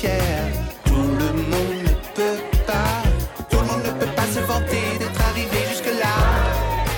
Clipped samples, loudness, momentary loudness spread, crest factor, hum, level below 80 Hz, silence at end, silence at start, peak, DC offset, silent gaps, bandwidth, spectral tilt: under 0.1%; -21 LUFS; 4 LU; 14 dB; none; -24 dBFS; 0 s; 0 s; -8 dBFS; under 0.1%; none; 19 kHz; -5 dB/octave